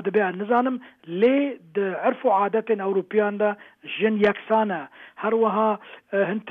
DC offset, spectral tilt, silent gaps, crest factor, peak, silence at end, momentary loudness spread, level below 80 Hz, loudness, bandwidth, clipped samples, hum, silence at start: under 0.1%; -8.5 dB/octave; none; 16 dB; -8 dBFS; 0 s; 11 LU; -70 dBFS; -23 LUFS; 4.5 kHz; under 0.1%; none; 0 s